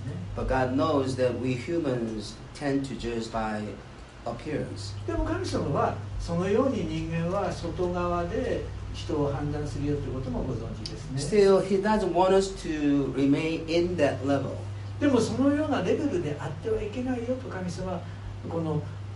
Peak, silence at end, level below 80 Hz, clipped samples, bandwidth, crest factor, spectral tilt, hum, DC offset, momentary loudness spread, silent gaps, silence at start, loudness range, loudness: -10 dBFS; 0 s; -42 dBFS; under 0.1%; 11.5 kHz; 18 dB; -6.5 dB/octave; none; under 0.1%; 11 LU; none; 0 s; 7 LU; -28 LUFS